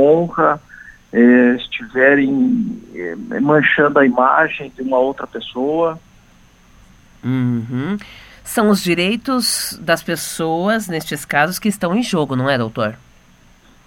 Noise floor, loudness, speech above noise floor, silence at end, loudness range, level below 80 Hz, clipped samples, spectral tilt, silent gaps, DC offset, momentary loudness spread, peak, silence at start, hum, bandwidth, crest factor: -48 dBFS; -16 LUFS; 32 dB; 0.9 s; 7 LU; -50 dBFS; under 0.1%; -5 dB/octave; none; under 0.1%; 12 LU; 0 dBFS; 0 s; none; 17 kHz; 16 dB